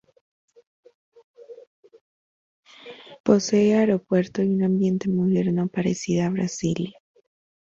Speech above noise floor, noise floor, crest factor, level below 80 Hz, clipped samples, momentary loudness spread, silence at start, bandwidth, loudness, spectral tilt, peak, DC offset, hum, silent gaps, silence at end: 23 dB; -44 dBFS; 20 dB; -60 dBFS; under 0.1%; 11 LU; 1.4 s; 7.8 kHz; -22 LUFS; -6.5 dB/octave; -4 dBFS; under 0.1%; none; 1.67-1.83 s, 2.01-2.63 s, 3.20-3.24 s; 0.85 s